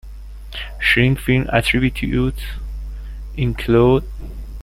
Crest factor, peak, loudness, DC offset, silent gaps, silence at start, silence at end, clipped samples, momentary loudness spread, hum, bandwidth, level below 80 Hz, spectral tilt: 18 dB; -2 dBFS; -17 LUFS; under 0.1%; none; 0.05 s; 0 s; under 0.1%; 19 LU; none; 16 kHz; -28 dBFS; -6.5 dB/octave